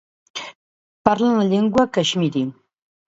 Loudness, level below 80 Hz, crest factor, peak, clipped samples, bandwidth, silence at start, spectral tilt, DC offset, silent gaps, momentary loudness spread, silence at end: -19 LUFS; -56 dBFS; 20 dB; 0 dBFS; under 0.1%; 8 kHz; 0.35 s; -5.5 dB/octave; under 0.1%; 0.55-1.05 s; 15 LU; 0.55 s